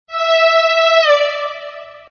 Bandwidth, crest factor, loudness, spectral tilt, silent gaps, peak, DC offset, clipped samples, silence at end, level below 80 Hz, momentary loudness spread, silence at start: 6.8 kHz; 14 dB; -12 LUFS; 2.5 dB/octave; none; 0 dBFS; under 0.1%; under 0.1%; 0.1 s; -68 dBFS; 16 LU; 0.1 s